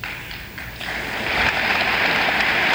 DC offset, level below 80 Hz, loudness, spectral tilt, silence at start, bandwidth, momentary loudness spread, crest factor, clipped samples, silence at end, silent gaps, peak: under 0.1%; -42 dBFS; -19 LUFS; -3 dB/octave; 0 s; 17 kHz; 14 LU; 18 dB; under 0.1%; 0 s; none; -4 dBFS